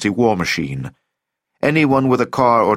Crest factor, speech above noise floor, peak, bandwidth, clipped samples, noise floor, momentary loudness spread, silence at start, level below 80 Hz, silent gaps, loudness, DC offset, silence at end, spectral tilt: 16 dB; 62 dB; -2 dBFS; 16 kHz; under 0.1%; -78 dBFS; 12 LU; 0 s; -50 dBFS; none; -16 LUFS; under 0.1%; 0 s; -6 dB/octave